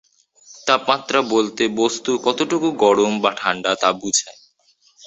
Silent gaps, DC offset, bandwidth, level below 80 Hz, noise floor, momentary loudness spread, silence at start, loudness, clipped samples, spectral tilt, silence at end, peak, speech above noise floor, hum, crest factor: none; under 0.1%; 8.2 kHz; -62 dBFS; -59 dBFS; 4 LU; 0.5 s; -19 LUFS; under 0.1%; -2.5 dB/octave; 0.75 s; -2 dBFS; 40 dB; none; 18 dB